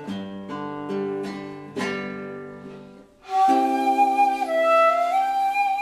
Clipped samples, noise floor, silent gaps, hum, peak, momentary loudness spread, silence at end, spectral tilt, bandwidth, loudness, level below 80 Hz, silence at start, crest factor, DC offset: under 0.1%; -45 dBFS; none; none; -8 dBFS; 17 LU; 0 s; -5 dB/octave; 14 kHz; -22 LUFS; -66 dBFS; 0 s; 16 dB; under 0.1%